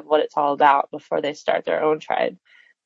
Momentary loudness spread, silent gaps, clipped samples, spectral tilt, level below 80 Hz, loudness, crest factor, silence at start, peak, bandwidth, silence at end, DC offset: 8 LU; none; under 0.1%; -4.5 dB/octave; -80 dBFS; -21 LUFS; 18 dB; 0.1 s; -4 dBFS; 7.8 kHz; 0.5 s; under 0.1%